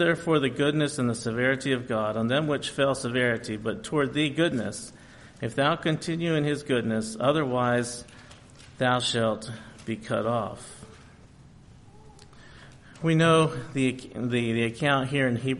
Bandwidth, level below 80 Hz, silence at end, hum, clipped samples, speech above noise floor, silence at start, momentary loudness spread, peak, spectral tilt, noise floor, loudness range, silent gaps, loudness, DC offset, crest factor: 11.5 kHz; -58 dBFS; 0 s; none; under 0.1%; 25 dB; 0 s; 12 LU; -10 dBFS; -5.5 dB/octave; -51 dBFS; 5 LU; none; -26 LUFS; under 0.1%; 18 dB